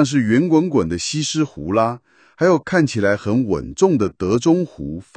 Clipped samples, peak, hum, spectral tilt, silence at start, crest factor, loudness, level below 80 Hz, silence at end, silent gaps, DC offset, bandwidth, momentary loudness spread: under 0.1%; -2 dBFS; none; -5.5 dB/octave; 0 s; 16 dB; -18 LUFS; -46 dBFS; 0.15 s; none; under 0.1%; 9.6 kHz; 7 LU